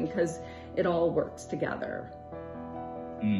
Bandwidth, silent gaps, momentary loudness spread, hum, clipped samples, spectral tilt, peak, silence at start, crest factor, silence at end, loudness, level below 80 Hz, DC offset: 11.5 kHz; none; 14 LU; none; under 0.1%; -6.5 dB/octave; -16 dBFS; 0 s; 16 dB; 0 s; -33 LUFS; -56 dBFS; under 0.1%